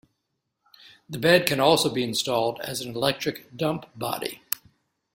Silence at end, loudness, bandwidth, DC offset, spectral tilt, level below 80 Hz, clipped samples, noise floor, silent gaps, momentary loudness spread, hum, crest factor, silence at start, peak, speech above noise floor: 0.6 s; -25 LUFS; 16.5 kHz; under 0.1%; -4 dB/octave; -64 dBFS; under 0.1%; -79 dBFS; none; 12 LU; none; 26 dB; 1.1 s; 0 dBFS; 54 dB